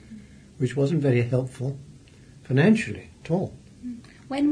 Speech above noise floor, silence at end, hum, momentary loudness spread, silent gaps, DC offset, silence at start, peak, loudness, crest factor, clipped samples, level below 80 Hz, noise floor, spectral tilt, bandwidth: 26 dB; 0 s; none; 20 LU; none; under 0.1%; 0.1 s; -8 dBFS; -25 LUFS; 18 dB; under 0.1%; -56 dBFS; -49 dBFS; -7.5 dB/octave; 10.5 kHz